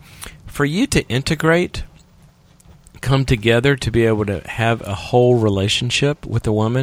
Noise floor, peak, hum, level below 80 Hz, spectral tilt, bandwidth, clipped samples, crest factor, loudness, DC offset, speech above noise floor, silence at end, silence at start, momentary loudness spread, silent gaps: -49 dBFS; 0 dBFS; none; -36 dBFS; -5.5 dB/octave; 15.5 kHz; under 0.1%; 18 dB; -18 LUFS; under 0.1%; 32 dB; 0 s; 0.2 s; 9 LU; none